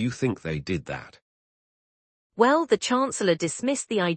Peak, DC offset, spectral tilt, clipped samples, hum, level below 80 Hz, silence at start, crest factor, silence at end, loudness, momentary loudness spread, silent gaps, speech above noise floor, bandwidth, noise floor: -6 dBFS; under 0.1%; -4.5 dB/octave; under 0.1%; none; -58 dBFS; 0 s; 20 dB; 0 s; -25 LUFS; 12 LU; 1.22-2.30 s; over 65 dB; 8.8 kHz; under -90 dBFS